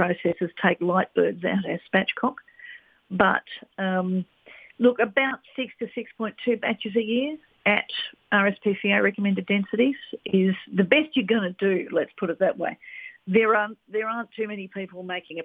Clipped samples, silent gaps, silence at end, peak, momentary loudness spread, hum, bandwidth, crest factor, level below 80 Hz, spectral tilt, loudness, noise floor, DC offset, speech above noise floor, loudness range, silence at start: under 0.1%; none; 0 s; -2 dBFS; 12 LU; none; 4.7 kHz; 24 dB; -68 dBFS; -8.5 dB/octave; -24 LUFS; -47 dBFS; under 0.1%; 22 dB; 3 LU; 0 s